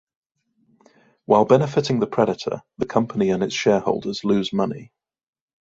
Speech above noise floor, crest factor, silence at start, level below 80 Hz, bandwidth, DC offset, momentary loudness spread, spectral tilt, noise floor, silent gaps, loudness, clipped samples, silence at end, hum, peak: 46 dB; 20 dB; 1.3 s; -58 dBFS; 7.8 kHz; under 0.1%; 10 LU; -6 dB/octave; -66 dBFS; none; -21 LUFS; under 0.1%; 0.75 s; none; -2 dBFS